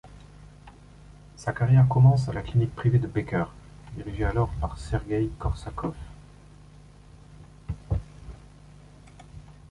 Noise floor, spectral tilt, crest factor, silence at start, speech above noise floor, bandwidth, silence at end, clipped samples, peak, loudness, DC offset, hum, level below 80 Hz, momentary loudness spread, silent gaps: -50 dBFS; -8.5 dB/octave; 18 dB; 0.05 s; 26 dB; 9.8 kHz; 0.2 s; under 0.1%; -8 dBFS; -26 LUFS; under 0.1%; 50 Hz at -45 dBFS; -40 dBFS; 26 LU; none